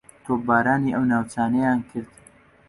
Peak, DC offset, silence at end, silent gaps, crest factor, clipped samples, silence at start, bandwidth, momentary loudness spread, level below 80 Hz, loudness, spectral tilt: -6 dBFS; under 0.1%; 0.65 s; none; 16 dB; under 0.1%; 0.25 s; 11.5 kHz; 9 LU; -56 dBFS; -22 LUFS; -7.5 dB/octave